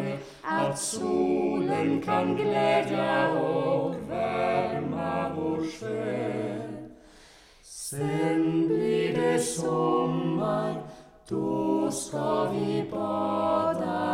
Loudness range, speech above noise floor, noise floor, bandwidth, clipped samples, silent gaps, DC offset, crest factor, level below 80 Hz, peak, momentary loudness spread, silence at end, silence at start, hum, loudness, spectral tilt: 5 LU; 27 dB; -54 dBFS; 15.5 kHz; under 0.1%; none; under 0.1%; 16 dB; -60 dBFS; -12 dBFS; 8 LU; 0 s; 0 s; none; -27 LUFS; -5.5 dB/octave